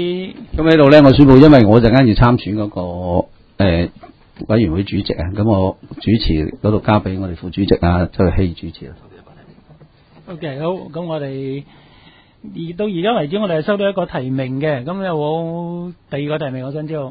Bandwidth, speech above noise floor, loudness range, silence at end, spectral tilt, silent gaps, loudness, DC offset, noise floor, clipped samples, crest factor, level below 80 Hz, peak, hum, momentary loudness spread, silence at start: 6 kHz; 32 dB; 16 LU; 0 s; -9.5 dB/octave; none; -15 LUFS; under 0.1%; -47 dBFS; 0.2%; 16 dB; -30 dBFS; 0 dBFS; none; 19 LU; 0 s